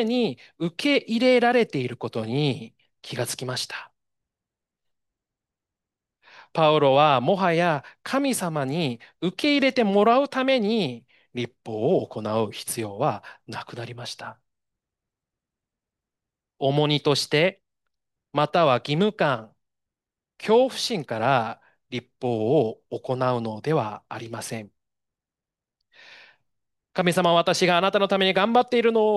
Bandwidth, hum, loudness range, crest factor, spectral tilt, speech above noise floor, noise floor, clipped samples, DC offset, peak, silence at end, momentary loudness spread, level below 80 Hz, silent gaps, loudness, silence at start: 12.5 kHz; none; 11 LU; 18 dB; -5 dB/octave; 67 dB; -90 dBFS; under 0.1%; under 0.1%; -6 dBFS; 0 s; 15 LU; -72 dBFS; none; -23 LUFS; 0 s